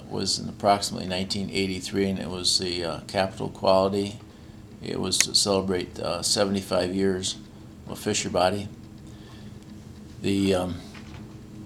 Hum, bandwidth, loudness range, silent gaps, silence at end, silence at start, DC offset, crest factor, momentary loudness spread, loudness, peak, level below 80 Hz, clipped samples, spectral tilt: none; 19 kHz; 5 LU; none; 0 s; 0 s; under 0.1%; 26 dB; 22 LU; -25 LUFS; 0 dBFS; -52 dBFS; under 0.1%; -3.5 dB/octave